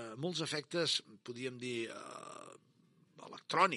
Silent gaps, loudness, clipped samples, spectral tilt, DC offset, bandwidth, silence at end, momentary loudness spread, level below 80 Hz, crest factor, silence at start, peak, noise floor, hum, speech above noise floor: none; -38 LUFS; under 0.1%; -3.5 dB/octave; under 0.1%; 11.5 kHz; 0 s; 19 LU; under -90 dBFS; 24 dB; 0 s; -14 dBFS; -69 dBFS; none; 32 dB